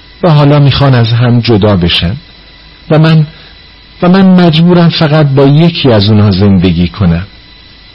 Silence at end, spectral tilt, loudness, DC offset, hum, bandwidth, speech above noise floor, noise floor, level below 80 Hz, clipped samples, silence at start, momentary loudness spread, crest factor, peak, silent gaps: 0.7 s; -9 dB/octave; -7 LUFS; under 0.1%; none; 5.8 kHz; 29 dB; -34 dBFS; -30 dBFS; 0.6%; 0.2 s; 6 LU; 6 dB; 0 dBFS; none